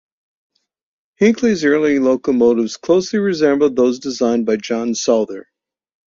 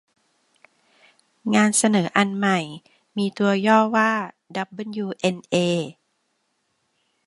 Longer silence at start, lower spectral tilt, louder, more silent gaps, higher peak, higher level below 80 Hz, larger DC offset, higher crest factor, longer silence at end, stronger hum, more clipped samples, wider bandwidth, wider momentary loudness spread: second, 1.2 s vs 1.45 s; about the same, -5 dB/octave vs -4.5 dB/octave; first, -16 LUFS vs -21 LUFS; neither; about the same, -2 dBFS vs -2 dBFS; first, -58 dBFS vs -70 dBFS; neither; second, 16 dB vs 22 dB; second, 0.75 s vs 1.35 s; neither; neither; second, 7.6 kHz vs 11.5 kHz; second, 5 LU vs 15 LU